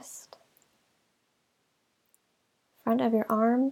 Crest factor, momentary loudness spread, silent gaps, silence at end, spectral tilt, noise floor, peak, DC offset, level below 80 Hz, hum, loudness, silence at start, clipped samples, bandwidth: 18 dB; 20 LU; none; 0 s; -6 dB/octave; -74 dBFS; -14 dBFS; under 0.1%; -82 dBFS; none; -27 LUFS; 0.05 s; under 0.1%; 17.5 kHz